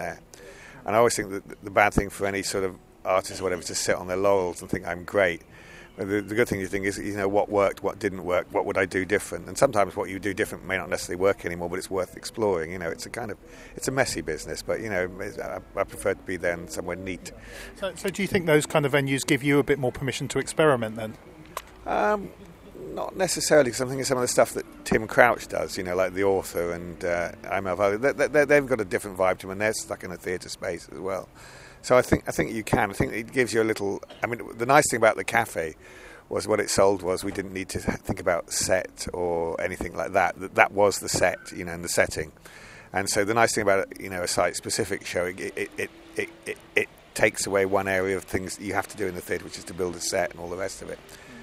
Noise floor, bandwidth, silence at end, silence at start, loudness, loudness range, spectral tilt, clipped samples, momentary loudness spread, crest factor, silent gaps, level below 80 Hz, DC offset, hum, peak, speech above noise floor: -45 dBFS; 16 kHz; 0 s; 0 s; -26 LUFS; 5 LU; -4 dB/octave; under 0.1%; 13 LU; 26 dB; none; -50 dBFS; under 0.1%; none; 0 dBFS; 20 dB